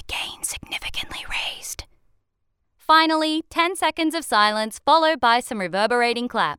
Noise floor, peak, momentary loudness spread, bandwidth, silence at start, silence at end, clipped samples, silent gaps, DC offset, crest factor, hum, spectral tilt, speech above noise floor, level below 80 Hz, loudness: -72 dBFS; -4 dBFS; 12 LU; 18.5 kHz; 0.05 s; 0 s; under 0.1%; none; under 0.1%; 18 dB; none; -2.5 dB/octave; 52 dB; -50 dBFS; -21 LUFS